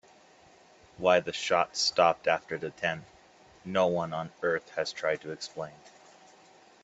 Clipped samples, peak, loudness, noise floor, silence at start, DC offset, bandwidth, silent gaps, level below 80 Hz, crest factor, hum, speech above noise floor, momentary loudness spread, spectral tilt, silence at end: under 0.1%; -8 dBFS; -29 LUFS; -58 dBFS; 1 s; under 0.1%; 8.4 kHz; none; -70 dBFS; 24 dB; none; 29 dB; 14 LU; -3.5 dB/octave; 0.95 s